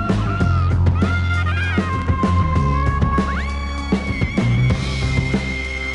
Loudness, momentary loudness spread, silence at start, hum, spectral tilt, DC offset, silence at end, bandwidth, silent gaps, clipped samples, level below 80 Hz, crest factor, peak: -19 LUFS; 5 LU; 0 s; none; -7 dB/octave; under 0.1%; 0 s; 10.5 kHz; none; under 0.1%; -26 dBFS; 12 dB; -6 dBFS